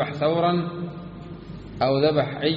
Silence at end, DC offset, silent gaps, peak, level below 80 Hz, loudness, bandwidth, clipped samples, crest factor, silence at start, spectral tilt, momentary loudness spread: 0 s; under 0.1%; none; -6 dBFS; -50 dBFS; -23 LUFS; 7 kHz; under 0.1%; 18 dB; 0 s; -5 dB/octave; 18 LU